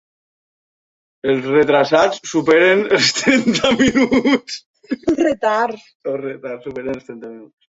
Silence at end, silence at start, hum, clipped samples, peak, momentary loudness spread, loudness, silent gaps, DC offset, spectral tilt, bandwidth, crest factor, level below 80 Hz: 0.3 s; 1.25 s; none; under 0.1%; -2 dBFS; 16 LU; -16 LUFS; 4.66-4.74 s, 5.95-6.00 s; under 0.1%; -4 dB/octave; 8 kHz; 16 dB; -50 dBFS